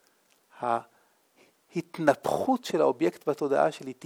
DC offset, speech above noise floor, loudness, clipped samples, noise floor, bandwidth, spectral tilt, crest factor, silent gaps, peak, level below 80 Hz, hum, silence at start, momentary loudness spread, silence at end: under 0.1%; 39 dB; -28 LUFS; under 0.1%; -66 dBFS; 18.5 kHz; -5.5 dB/octave; 22 dB; none; -6 dBFS; -74 dBFS; none; 0.6 s; 10 LU; 0.1 s